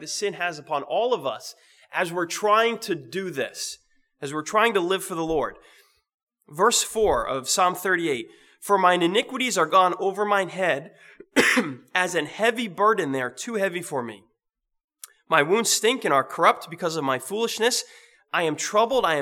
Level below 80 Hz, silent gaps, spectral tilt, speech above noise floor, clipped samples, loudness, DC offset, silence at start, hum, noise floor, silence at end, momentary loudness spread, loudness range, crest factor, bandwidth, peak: -56 dBFS; 6.14-6.27 s, 14.84-14.88 s; -2.5 dB/octave; 57 dB; under 0.1%; -23 LUFS; under 0.1%; 0 s; none; -80 dBFS; 0 s; 12 LU; 4 LU; 22 dB; 19.5 kHz; -2 dBFS